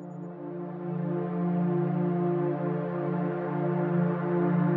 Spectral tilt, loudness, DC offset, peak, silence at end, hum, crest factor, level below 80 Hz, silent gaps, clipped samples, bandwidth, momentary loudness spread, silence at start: -12 dB/octave; -29 LUFS; under 0.1%; -16 dBFS; 0 s; none; 14 dB; -80 dBFS; none; under 0.1%; 3.5 kHz; 10 LU; 0 s